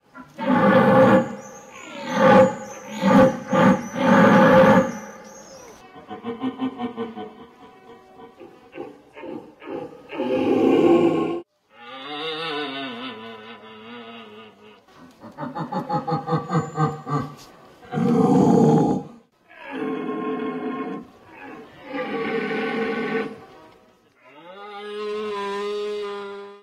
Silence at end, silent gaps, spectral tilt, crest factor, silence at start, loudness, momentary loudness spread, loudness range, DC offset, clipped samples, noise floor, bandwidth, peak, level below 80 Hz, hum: 0.05 s; none; -7 dB/octave; 16 dB; 0.15 s; -20 LUFS; 24 LU; 16 LU; under 0.1%; under 0.1%; -56 dBFS; 13 kHz; -6 dBFS; -58 dBFS; none